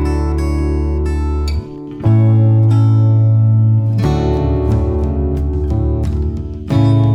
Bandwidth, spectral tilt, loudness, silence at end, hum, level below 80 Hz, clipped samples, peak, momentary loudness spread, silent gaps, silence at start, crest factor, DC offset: 7 kHz; -9.5 dB/octave; -14 LUFS; 0 s; none; -20 dBFS; under 0.1%; -2 dBFS; 8 LU; none; 0 s; 10 dB; under 0.1%